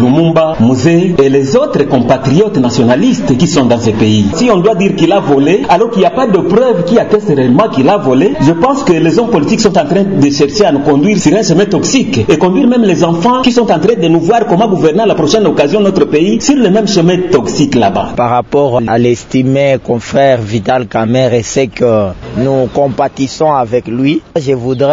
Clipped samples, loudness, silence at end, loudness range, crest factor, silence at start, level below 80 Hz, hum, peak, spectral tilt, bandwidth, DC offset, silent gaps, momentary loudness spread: 0.4%; -9 LUFS; 0 s; 2 LU; 8 dB; 0 s; -40 dBFS; none; 0 dBFS; -6 dB/octave; 7.8 kHz; 1%; none; 4 LU